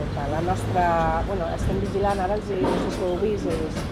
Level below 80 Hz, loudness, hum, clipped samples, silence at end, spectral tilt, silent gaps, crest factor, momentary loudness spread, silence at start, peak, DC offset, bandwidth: -34 dBFS; -24 LUFS; none; under 0.1%; 0 s; -6.5 dB/octave; none; 14 dB; 5 LU; 0 s; -10 dBFS; under 0.1%; 14.5 kHz